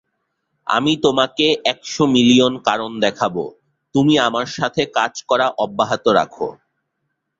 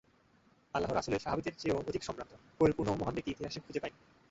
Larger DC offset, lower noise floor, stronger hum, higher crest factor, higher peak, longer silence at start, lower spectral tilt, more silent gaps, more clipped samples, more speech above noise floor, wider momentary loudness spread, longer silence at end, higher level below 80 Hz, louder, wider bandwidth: neither; first, -74 dBFS vs -68 dBFS; neither; about the same, 18 dB vs 22 dB; first, -2 dBFS vs -14 dBFS; about the same, 0.65 s vs 0.75 s; about the same, -4.5 dB/octave vs -5.5 dB/octave; neither; neither; first, 57 dB vs 32 dB; second, 9 LU vs 12 LU; first, 0.9 s vs 0.4 s; about the same, -58 dBFS vs -58 dBFS; first, -17 LUFS vs -36 LUFS; about the same, 7.8 kHz vs 8 kHz